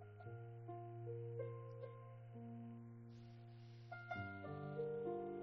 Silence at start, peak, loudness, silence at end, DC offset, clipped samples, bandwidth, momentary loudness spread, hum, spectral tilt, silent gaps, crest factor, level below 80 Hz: 0 s; -34 dBFS; -52 LUFS; 0 s; under 0.1%; under 0.1%; 6 kHz; 13 LU; none; -7.5 dB/octave; none; 16 dB; -82 dBFS